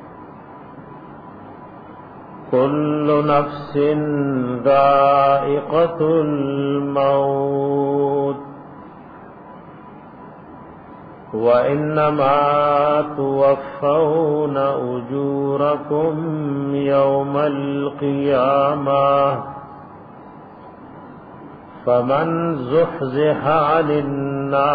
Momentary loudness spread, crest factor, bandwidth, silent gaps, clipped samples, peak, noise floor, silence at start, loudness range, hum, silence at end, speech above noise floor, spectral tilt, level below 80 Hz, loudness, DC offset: 23 LU; 14 dB; 5 kHz; none; under 0.1%; -4 dBFS; -39 dBFS; 0 s; 7 LU; none; 0 s; 22 dB; -10.5 dB/octave; -56 dBFS; -18 LUFS; under 0.1%